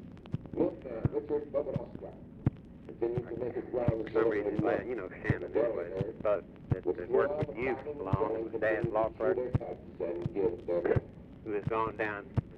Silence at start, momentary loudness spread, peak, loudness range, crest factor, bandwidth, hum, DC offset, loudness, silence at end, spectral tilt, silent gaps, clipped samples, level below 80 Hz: 0 s; 9 LU; -16 dBFS; 3 LU; 18 dB; 6 kHz; none; under 0.1%; -34 LUFS; 0 s; -10 dB/octave; none; under 0.1%; -52 dBFS